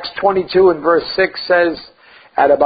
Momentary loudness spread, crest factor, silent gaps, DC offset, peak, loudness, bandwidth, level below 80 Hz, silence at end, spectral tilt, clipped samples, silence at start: 7 LU; 14 dB; none; under 0.1%; 0 dBFS; -15 LUFS; 5 kHz; -50 dBFS; 0 s; -10 dB/octave; under 0.1%; 0 s